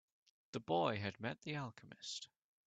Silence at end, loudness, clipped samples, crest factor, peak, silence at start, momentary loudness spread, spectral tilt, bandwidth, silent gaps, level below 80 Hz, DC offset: 0.4 s; -43 LUFS; under 0.1%; 22 dB; -22 dBFS; 0.55 s; 13 LU; -5 dB/octave; 9 kHz; none; -80 dBFS; under 0.1%